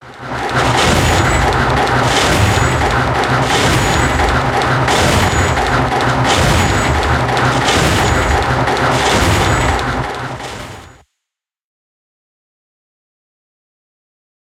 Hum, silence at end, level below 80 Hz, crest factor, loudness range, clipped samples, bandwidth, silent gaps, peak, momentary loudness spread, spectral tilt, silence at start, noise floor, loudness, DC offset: none; 3.55 s; -26 dBFS; 14 dB; 7 LU; under 0.1%; 16.5 kHz; none; 0 dBFS; 7 LU; -4.5 dB/octave; 0 s; -81 dBFS; -13 LUFS; under 0.1%